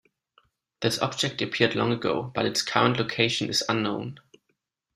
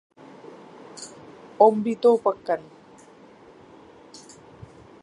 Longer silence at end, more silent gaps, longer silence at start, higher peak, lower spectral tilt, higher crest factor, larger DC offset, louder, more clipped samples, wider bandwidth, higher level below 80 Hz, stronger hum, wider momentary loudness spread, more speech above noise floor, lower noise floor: second, 0.75 s vs 2.4 s; neither; second, 0.8 s vs 0.95 s; about the same, -4 dBFS vs -2 dBFS; second, -4 dB/octave vs -6 dB/octave; about the same, 24 dB vs 24 dB; neither; second, -25 LUFS vs -21 LUFS; neither; first, 15.5 kHz vs 11 kHz; first, -62 dBFS vs -68 dBFS; neither; second, 6 LU vs 27 LU; first, 51 dB vs 30 dB; first, -76 dBFS vs -50 dBFS